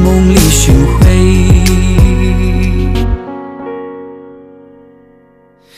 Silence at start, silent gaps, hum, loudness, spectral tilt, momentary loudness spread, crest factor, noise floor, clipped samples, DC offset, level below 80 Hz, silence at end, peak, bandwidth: 0 s; none; none; -9 LUFS; -5.5 dB/octave; 17 LU; 10 dB; -45 dBFS; 1%; under 0.1%; -14 dBFS; 1.45 s; 0 dBFS; 16 kHz